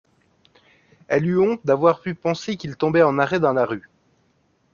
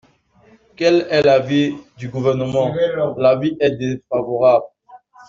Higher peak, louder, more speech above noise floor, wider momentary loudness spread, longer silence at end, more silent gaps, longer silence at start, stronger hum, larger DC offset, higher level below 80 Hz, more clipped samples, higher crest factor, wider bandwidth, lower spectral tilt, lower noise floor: about the same, -2 dBFS vs -2 dBFS; second, -20 LUFS vs -17 LUFS; first, 44 dB vs 36 dB; about the same, 8 LU vs 9 LU; first, 0.95 s vs 0.3 s; neither; first, 1.1 s vs 0.8 s; neither; neither; about the same, -60 dBFS vs -56 dBFS; neither; about the same, 20 dB vs 16 dB; about the same, 7.2 kHz vs 7.6 kHz; about the same, -7 dB/octave vs -6.5 dB/octave; first, -64 dBFS vs -53 dBFS